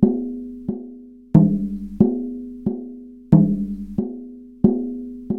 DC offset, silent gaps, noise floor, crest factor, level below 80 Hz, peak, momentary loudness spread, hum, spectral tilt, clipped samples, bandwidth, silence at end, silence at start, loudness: 0.2%; none; -40 dBFS; 20 dB; -44 dBFS; -2 dBFS; 18 LU; none; -12.5 dB/octave; under 0.1%; 2.1 kHz; 0 s; 0 s; -21 LUFS